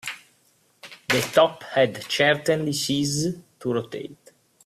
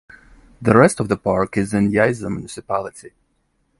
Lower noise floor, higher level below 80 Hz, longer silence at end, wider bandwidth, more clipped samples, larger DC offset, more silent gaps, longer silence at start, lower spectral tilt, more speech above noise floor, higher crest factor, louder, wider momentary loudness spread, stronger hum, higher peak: about the same, -63 dBFS vs -66 dBFS; second, -62 dBFS vs -46 dBFS; second, 0.5 s vs 0.7 s; first, 15.5 kHz vs 11.5 kHz; neither; neither; neither; second, 0.05 s vs 0.6 s; second, -4 dB/octave vs -6.5 dB/octave; second, 40 dB vs 48 dB; about the same, 20 dB vs 20 dB; second, -23 LUFS vs -18 LUFS; first, 17 LU vs 13 LU; neither; second, -4 dBFS vs 0 dBFS